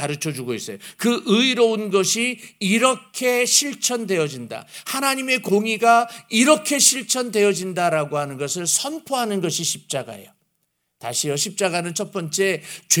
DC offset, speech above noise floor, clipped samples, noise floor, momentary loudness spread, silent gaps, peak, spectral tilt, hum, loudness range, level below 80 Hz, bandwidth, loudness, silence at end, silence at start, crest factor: under 0.1%; 51 dB; under 0.1%; -72 dBFS; 11 LU; none; 0 dBFS; -2.5 dB/octave; none; 6 LU; -74 dBFS; over 20 kHz; -20 LUFS; 0 s; 0 s; 22 dB